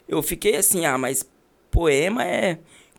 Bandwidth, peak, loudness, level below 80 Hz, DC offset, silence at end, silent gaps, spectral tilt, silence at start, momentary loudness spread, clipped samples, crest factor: over 20 kHz; -6 dBFS; -21 LUFS; -34 dBFS; under 0.1%; 0.4 s; none; -3.5 dB/octave; 0.1 s; 9 LU; under 0.1%; 16 dB